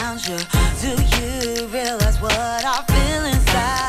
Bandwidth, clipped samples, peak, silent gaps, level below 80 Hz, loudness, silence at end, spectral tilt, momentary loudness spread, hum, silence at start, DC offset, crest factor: 16 kHz; under 0.1%; -4 dBFS; none; -22 dBFS; -20 LUFS; 0 s; -4 dB/octave; 5 LU; none; 0 s; under 0.1%; 16 dB